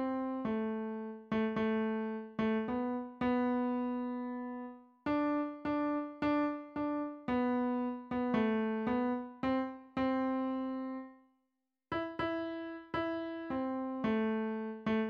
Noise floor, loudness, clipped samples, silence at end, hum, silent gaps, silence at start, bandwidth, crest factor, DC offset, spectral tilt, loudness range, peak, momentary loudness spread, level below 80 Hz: -85 dBFS; -36 LUFS; under 0.1%; 0 s; none; none; 0 s; 5.6 kHz; 16 dB; under 0.1%; -8 dB/octave; 4 LU; -18 dBFS; 8 LU; -66 dBFS